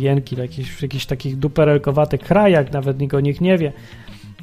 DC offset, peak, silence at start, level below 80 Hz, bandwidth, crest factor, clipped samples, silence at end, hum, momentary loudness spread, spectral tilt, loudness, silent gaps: under 0.1%; -2 dBFS; 0 s; -42 dBFS; 14.5 kHz; 16 dB; under 0.1%; 0 s; none; 11 LU; -8 dB/octave; -18 LUFS; none